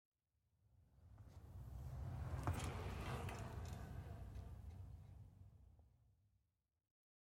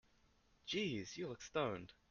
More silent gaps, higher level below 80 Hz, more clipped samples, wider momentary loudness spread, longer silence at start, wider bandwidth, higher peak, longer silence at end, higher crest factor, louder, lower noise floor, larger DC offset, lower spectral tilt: neither; first, -58 dBFS vs -72 dBFS; neither; first, 18 LU vs 9 LU; about the same, 0.7 s vs 0.65 s; first, 16.5 kHz vs 7.4 kHz; second, -28 dBFS vs -24 dBFS; first, 1.15 s vs 0.2 s; about the same, 24 dB vs 20 dB; second, -51 LUFS vs -43 LUFS; first, -86 dBFS vs -74 dBFS; neither; first, -6 dB/octave vs -4.5 dB/octave